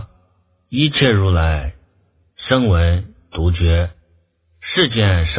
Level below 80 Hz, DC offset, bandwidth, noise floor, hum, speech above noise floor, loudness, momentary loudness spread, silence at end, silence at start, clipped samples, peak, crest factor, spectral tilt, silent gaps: -24 dBFS; under 0.1%; 4 kHz; -59 dBFS; none; 44 dB; -17 LUFS; 13 LU; 0 s; 0 s; under 0.1%; 0 dBFS; 18 dB; -10.5 dB/octave; none